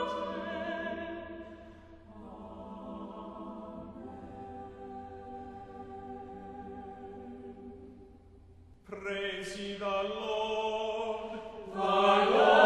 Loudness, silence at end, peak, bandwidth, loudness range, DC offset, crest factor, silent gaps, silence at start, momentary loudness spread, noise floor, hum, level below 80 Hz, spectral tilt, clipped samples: -33 LUFS; 0 s; -8 dBFS; 11.5 kHz; 14 LU; under 0.1%; 26 dB; none; 0 s; 19 LU; -56 dBFS; none; -60 dBFS; -4.5 dB/octave; under 0.1%